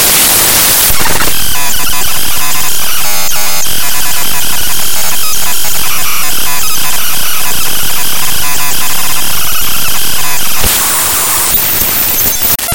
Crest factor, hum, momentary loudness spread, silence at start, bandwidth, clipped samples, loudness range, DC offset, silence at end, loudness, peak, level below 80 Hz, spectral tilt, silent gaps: 12 dB; none; 6 LU; 0 s; over 20 kHz; 2%; 3 LU; 60%; 0 s; -9 LUFS; 0 dBFS; -30 dBFS; -0.5 dB/octave; none